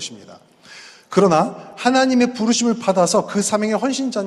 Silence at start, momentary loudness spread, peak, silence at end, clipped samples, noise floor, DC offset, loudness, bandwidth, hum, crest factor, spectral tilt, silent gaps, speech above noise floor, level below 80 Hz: 0 s; 6 LU; 0 dBFS; 0 s; under 0.1%; -42 dBFS; under 0.1%; -18 LUFS; 12.5 kHz; none; 18 dB; -4 dB/octave; none; 25 dB; -62 dBFS